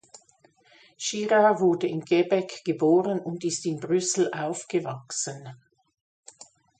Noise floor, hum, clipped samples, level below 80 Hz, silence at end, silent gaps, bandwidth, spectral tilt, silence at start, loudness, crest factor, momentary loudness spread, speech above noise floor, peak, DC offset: -61 dBFS; none; under 0.1%; -74 dBFS; 1.25 s; none; 9.4 kHz; -4.5 dB/octave; 0.15 s; -25 LUFS; 18 dB; 11 LU; 36 dB; -8 dBFS; under 0.1%